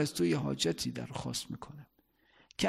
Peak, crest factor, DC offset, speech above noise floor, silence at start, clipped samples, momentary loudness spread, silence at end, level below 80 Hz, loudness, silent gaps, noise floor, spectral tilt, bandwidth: -16 dBFS; 18 dB; under 0.1%; 33 dB; 0 s; under 0.1%; 17 LU; 0 s; -62 dBFS; -34 LUFS; none; -68 dBFS; -4.5 dB/octave; 16 kHz